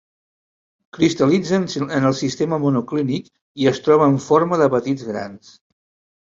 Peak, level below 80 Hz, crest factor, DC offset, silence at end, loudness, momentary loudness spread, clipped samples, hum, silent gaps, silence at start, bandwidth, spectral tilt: -2 dBFS; -58 dBFS; 18 dB; under 0.1%; 0.85 s; -19 LUFS; 11 LU; under 0.1%; none; 3.41-3.55 s; 0.95 s; 7.8 kHz; -6.5 dB/octave